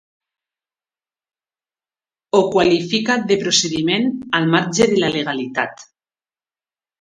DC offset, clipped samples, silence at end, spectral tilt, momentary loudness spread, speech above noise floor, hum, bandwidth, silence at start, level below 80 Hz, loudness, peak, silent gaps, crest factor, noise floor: under 0.1%; under 0.1%; 1.2 s; -4 dB/octave; 7 LU; over 73 dB; none; 11 kHz; 2.35 s; -56 dBFS; -17 LUFS; 0 dBFS; none; 20 dB; under -90 dBFS